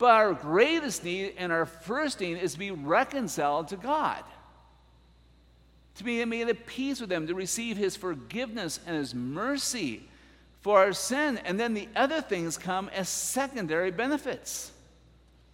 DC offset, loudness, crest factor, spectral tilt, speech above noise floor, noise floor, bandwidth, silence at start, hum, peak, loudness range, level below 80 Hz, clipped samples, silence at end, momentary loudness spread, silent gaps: under 0.1%; -29 LUFS; 22 dB; -3.5 dB/octave; 30 dB; -59 dBFS; 16.5 kHz; 0 s; none; -8 dBFS; 5 LU; -60 dBFS; under 0.1%; 0.8 s; 11 LU; none